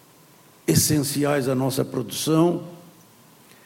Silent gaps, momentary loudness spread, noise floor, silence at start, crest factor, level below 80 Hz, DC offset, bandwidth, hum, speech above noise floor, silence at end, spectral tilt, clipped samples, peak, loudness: none; 10 LU; -52 dBFS; 0.65 s; 18 dB; -56 dBFS; under 0.1%; 17 kHz; none; 30 dB; 0.9 s; -5 dB/octave; under 0.1%; -4 dBFS; -22 LUFS